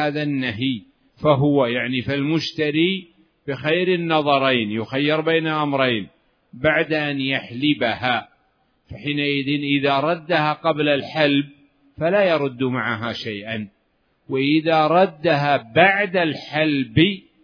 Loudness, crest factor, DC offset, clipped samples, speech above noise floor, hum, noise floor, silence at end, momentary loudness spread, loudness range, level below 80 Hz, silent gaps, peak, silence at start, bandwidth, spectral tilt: -20 LUFS; 20 dB; under 0.1%; under 0.1%; 46 dB; none; -65 dBFS; 0.25 s; 9 LU; 3 LU; -58 dBFS; none; 0 dBFS; 0 s; 5.4 kHz; -7 dB/octave